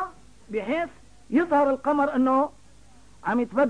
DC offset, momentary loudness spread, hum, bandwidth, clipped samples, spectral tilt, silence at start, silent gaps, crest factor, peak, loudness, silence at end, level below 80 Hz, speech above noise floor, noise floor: 0.3%; 12 LU; none; 10 kHz; under 0.1%; -6.5 dB/octave; 0 s; none; 14 dB; -12 dBFS; -25 LUFS; 0 s; -58 dBFS; 31 dB; -54 dBFS